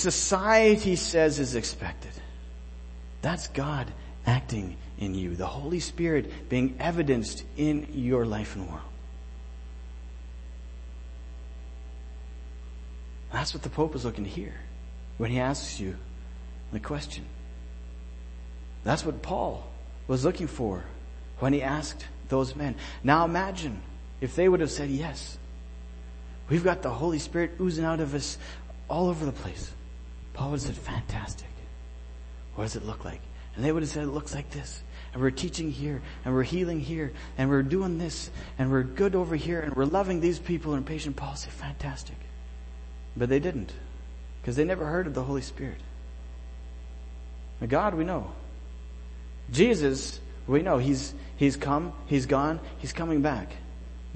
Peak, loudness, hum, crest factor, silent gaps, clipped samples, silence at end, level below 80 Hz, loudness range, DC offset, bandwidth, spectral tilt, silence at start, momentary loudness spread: -6 dBFS; -29 LUFS; none; 22 dB; none; under 0.1%; 0 s; -40 dBFS; 8 LU; under 0.1%; 8.8 kHz; -5.5 dB/octave; 0 s; 19 LU